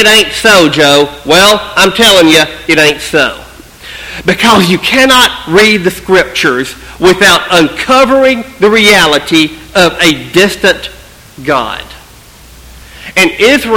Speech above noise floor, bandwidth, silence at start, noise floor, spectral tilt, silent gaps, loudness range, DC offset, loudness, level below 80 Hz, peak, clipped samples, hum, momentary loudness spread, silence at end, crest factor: 28 dB; over 20 kHz; 0 s; -35 dBFS; -3 dB/octave; none; 5 LU; under 0.1%; -6 LUFS; -36 dBFS; 0 dBFS; 3%; none; 11 LU; 0 s; 8 dB